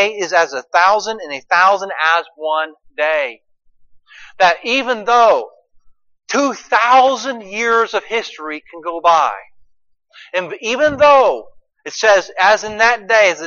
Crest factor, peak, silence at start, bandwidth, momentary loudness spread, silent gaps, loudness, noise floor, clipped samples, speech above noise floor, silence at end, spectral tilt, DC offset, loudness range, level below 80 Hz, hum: 16 dB; 0 dBFS; 0 s; 7.4 kHz; 14 LU; none; -14 LUFS; -47 dBFS; under 0.1%; 33 dB; 0 s; -2 dB/octave; under 0.1%; 4 LU; -56 dBFS; none